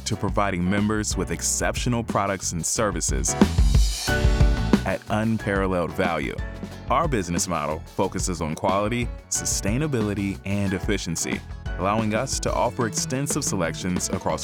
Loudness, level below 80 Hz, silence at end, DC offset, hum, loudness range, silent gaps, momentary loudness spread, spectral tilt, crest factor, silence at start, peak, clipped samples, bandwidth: -24 LUFS; -30 dBFS; 0 s; under 0.1%; none; 3 LU; none; 6 LU; -4.5 dB/octave; 18 dB; 0 s; -6 dBFS; under 0.1%; 19 kHz